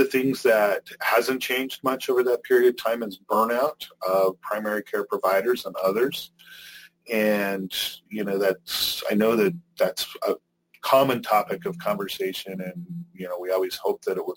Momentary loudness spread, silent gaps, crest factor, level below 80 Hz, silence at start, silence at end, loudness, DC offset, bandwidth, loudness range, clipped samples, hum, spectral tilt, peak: 13 LU; none; 18 dB; -68 dBFS; 0 s; 0 s; -24 LUFS; under 0.1%; 17 kHz; 3 LU; under 0.1%; none; -4 dB/octave; -6 dBFS